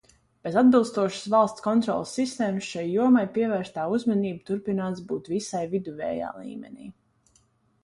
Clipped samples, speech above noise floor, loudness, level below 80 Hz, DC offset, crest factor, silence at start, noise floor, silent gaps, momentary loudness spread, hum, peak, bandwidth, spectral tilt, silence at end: under 0.1%; 40 dB; -25 LUFS; -66 dBFS; under 0.1%; 18 dB; 0.45 s; -65 dBFS; none; 13 LU; none; -8 dBFS; 11.5 kHz; -6 dB/octave; 0.9 s